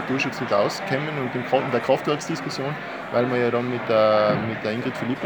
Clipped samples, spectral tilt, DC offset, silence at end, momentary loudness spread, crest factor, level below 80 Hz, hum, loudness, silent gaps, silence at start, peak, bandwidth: under 0.1%; -5.5 dB/octave; under 0.1%; 0 s; 8 LU; 16 dB; -62 dBFS; none; -23 LUFS; none; 0 s; -6 dBFS; over 20 kHz